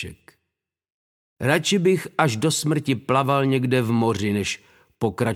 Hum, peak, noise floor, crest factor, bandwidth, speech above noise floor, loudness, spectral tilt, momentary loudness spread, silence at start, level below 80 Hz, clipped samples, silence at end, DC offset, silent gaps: none; -4 dBFS; -81 dBFS; 18 dB; 16.5 kHz; 60 dB; -22 LUFS; -5 dB/octave; 8 LU; 0 s; -58 dBFS; under 0.1%; 0 s; under 0.1%; 0.92-1.36 s